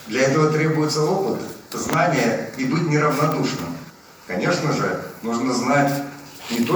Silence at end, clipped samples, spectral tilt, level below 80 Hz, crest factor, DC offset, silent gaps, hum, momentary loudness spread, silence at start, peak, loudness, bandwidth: 0 s; under 0.1%; -5.5 dB/octave; -60 dBFS; 18 dB; under 0.1%; none; none; 11 LU; 0 s; -4 dBFS; -21 LUFS; over 20 kHz